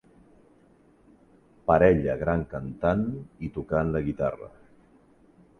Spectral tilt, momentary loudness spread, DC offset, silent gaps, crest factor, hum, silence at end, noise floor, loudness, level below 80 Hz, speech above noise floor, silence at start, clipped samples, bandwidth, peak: -10 dB/octave; 16 LU; under 0.1%; none; 22 dB; none; 1.1 s; -59 dBFS; -26 LUFS; -46 dBFS; 34 dB; 1.65 s; under 0.1%; 6.6 kHz; -6 dBFS